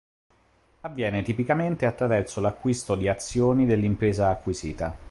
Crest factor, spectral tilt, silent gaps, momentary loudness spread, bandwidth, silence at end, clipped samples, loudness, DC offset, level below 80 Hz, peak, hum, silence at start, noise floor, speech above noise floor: 18 dB; -6.5 dB/octave; none; 9 LU; 11.5 kHz; 0 s; under 0.1%; -25 LUFS; under 0.1%; -44 dBFS; -8 dBFS; none; 0.85 s; -62 dBFS; 38 dB